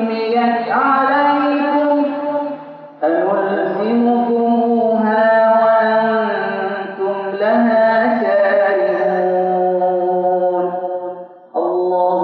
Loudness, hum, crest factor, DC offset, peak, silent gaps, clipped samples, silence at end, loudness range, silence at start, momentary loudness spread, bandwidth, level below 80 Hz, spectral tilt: -15 LUFS; none; 12 dB; under 0.1%; -4 dBFS; none; under 0.1%; 0 s; 3 LU; 0 s; 9 LU; 5.2 kHz; -80 dBFS; -9 dB/octave